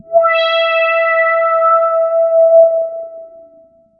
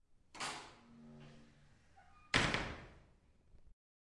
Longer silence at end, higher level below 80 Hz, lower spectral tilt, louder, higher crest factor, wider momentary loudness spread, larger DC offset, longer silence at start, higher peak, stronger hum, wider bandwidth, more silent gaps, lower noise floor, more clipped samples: first, 0.7 s vs 0.4 s; second, -68 dBFS vs -60 dBFS; about the same, -2 dB/octave vs -3 dB/octave; first, -11 LUFS vs -39 LUFS; second, 12 dB vs 30 dB; second, 10 LU vs 26 LU; neither; second, 0.1 s vs 0.35 s; first, 0 dBFS vs -14 dBFS; neither; second, 5.6 kHz vs 11.5 kHz; neither; second, -46 dBFS vs -68 dBFS; neither